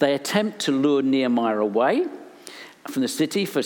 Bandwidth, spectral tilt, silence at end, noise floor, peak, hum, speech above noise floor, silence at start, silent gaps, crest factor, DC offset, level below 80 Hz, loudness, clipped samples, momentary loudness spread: 19 kHz; -4.5 dB/octave; 0 s; -43 dBFS; -6 dBFS; none; 21 dB; 0 s; none; 18 dB; under 0.1%; -80 dBFS; -22 LUFS; under 0.1%; 19 LU